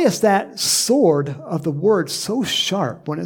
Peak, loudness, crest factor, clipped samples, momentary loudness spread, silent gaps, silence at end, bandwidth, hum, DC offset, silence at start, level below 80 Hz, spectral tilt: -4 dBFS; -18 LUFS; 16 dB; under 0.1%; 9 LU; none; 0 s; 19 kHz; none; under 0.1%; 0 s; -62 dBFS; -4 dB/octave